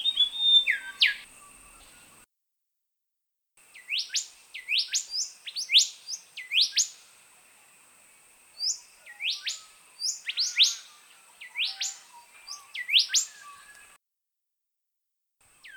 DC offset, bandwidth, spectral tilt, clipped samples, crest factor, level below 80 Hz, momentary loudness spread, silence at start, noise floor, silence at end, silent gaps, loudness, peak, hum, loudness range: under 0.1%; over 20 kHz; 5.5 dB/octave; under 0.1%; 22 dB; -74 dBFS; 18 LU; 0 s; -85 dBFS; 0 s; none; -25 LUFS; -8 dBFS; none; 8 LU